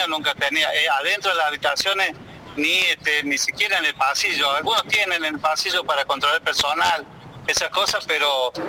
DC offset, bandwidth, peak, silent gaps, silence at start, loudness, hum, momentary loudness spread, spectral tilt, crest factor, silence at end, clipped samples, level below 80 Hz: under 0.1%; 17 kHz; -8 dBFS; none; 0 s; -20 LUFS; none; 4 LU; -1 dB/octave; 14 dB; 0 s; under 0.1%; -58 dBFS